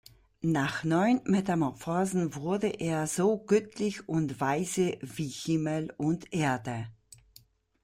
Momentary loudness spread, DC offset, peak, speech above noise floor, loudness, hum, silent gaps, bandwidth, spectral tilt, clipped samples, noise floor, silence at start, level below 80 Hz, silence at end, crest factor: 8 LU; under 0.1%; -12 dBFS; 32 dB; -30 LUFS; none; none; 16 kHz; -6 dB/octave; under 0.1%; -61 dBFS; 0.4 s; -64 dBFS; 0.9 s; 18 dB